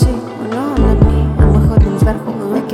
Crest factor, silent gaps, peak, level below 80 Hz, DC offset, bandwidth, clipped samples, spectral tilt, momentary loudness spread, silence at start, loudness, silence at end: 12 dB; none; 0 dBFS; -16 dBFS; under 0.1%; 13 kHz; under 0.1%; -8.5 dB/octave; 9 LU; 0 s; -14 LUFS; 0 s